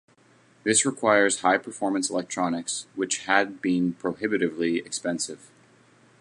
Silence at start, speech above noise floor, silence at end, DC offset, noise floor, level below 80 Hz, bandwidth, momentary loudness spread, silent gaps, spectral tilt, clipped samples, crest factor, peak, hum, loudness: 0.65 s; 33 dB; 0.85 s; under 0.1%; -59 dBFS; -70 dBFS; 11.5 kHz; 9 LU; none; -3 dB/octave; under 0.1%; 22 dB; -4 dBFS; none; -25 LUFS